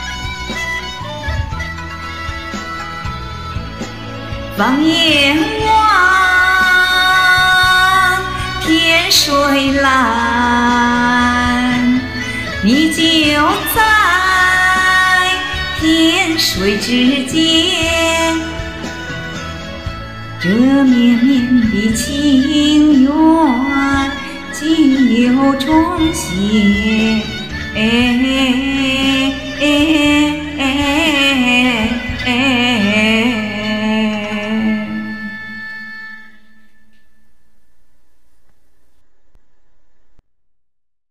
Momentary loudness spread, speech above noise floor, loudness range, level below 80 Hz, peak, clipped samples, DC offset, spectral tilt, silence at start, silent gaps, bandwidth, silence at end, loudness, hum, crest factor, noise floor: 15 LU; 56 dB; 10 LU; -34 dBFS; 0 dBFS; under 0.1%; 1%; -3.5 dB/octave; 0 s; none; 16 kHz; 0.5 s; -12 LUFS; none; 12 dB; -67 dBFS